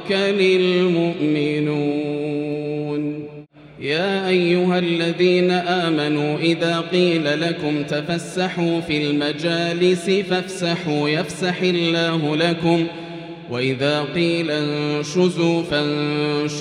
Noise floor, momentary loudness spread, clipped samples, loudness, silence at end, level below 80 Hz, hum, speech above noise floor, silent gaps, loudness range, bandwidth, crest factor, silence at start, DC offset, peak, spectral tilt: -40 dBFS; 7 LU; under 0.1%; -20 LUFS; 0 s; -60 dBFS; none; 21 dB; none; 3 LU; 11.5 kHz; 16 dB; 0 s; under 0.1%; -4 dBFS; -6 dB/octave